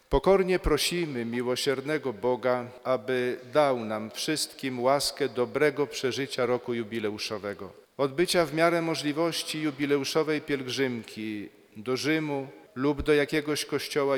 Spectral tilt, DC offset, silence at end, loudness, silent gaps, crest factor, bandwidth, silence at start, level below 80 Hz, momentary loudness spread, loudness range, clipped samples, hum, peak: -4.5 dB/octave; under 0.1%; 0 s; -28 LUFS; none; 20 dB; 19 kHz; 0.1 s; -48 dBFS; 9 LU; 2 LU; under 0.1%; none; -8 dBFS